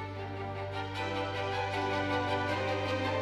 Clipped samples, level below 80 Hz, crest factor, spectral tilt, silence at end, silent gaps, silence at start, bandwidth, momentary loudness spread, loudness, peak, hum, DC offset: under 0.1%; -60 dBFS; 14 dB; -5.5 dB/octave; 0 s; none; 0 s; 11.5 kHz; 7 LU; -33 LUFS; -20 dBFS; 50 Hz at -55 dBFS; under 0.1%